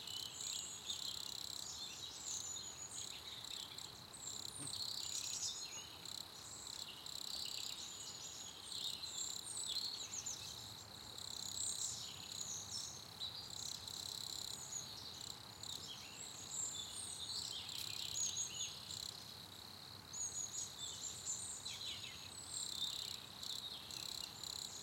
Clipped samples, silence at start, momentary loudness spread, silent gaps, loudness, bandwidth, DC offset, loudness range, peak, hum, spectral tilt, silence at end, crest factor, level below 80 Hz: under 0.1%; 0 s; 8 LU; none; -45 LUFS; 17 kHz; under 0.1%; 3 LU; -28 dBFS; none; 0 dB/octave; 0 s; 20 dB; -76 dBFS